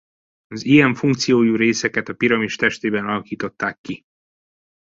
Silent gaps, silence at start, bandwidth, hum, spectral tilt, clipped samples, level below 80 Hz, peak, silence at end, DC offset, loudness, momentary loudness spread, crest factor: 3.78-3.84 s; 0.5 s; 8 kHz; none; -5 dB/octave; under 0.1%; -58 dBFS; -2 dBFS; 0.9 s; under 0.1%; -18 LUFS; 16 LU; 18 dB